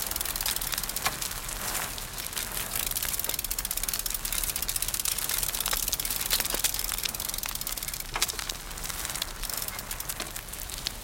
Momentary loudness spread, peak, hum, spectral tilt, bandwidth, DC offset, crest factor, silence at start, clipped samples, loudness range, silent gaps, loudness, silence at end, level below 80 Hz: 7 LU; -6 dBFS; none; -0.5 dB/octave; 17.5 kHz; under 0.1%; 26 dB; 0 s; under 0.1%; 4 LU; none; -29 LUFS; 0 s; -44 dBFS